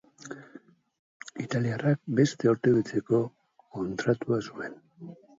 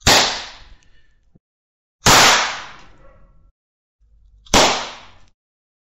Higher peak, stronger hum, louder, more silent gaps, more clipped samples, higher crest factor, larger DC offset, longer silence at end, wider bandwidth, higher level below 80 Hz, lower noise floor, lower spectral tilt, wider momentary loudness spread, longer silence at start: second, -10 dBFS vs -2 dBFS; neither; second, -28 LUFS vs -14 LUFS; second, 0.99-1.20 s vs 1.40-1.99 s, 3.51-3.99 s; neither; about the same, 20 dB vs 18 dB; neither; second, 0.25 s vs 0.95 s; second, 7.8 kHz vs 16 kHz; second, -66 dBFS vs -36 dBFS; about the same, -53 dBFS vs -51 dBFS; first, -7 dB/octave vs -1.5 dB/octave; about the same, 20 LU vs 21 LU; first, 0.25 s vs 0.05 s